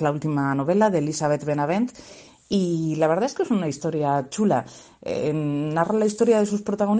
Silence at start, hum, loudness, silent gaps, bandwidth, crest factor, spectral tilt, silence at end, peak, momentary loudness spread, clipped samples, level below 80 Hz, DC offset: 0 s; none; -23 LUFS; none; 9.6 kHz; 16 dB; -6.5 dB/octave; 0 s; -6 dBFS; 7 LU; under 0.1%; -62 dBFS; under 0.1%